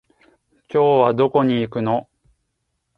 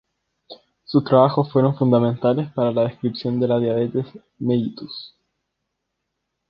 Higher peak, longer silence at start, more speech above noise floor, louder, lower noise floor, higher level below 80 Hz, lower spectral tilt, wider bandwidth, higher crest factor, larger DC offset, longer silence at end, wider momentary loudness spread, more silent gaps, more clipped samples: about the same, -2 dBFS vs 0 dBFS; first, 0.75 s vs 0.5 s; about the same, 57 dB vs 58 dB; about the same, -18 LUFS vs -20 LUFS; second, -73 dBFS vs -78 dBFS; about the same, -60 dBFS vs -62 dBFS; second, -9 dB/octave vs -10.5 dB/octave; second, 4.8 kHz vs 5.4 kHz; about the same, 20 dB vs 20 dB; neither; second, 0.95 s vs 1.45 s; second, 8 LU vs 13 LU; neither; neither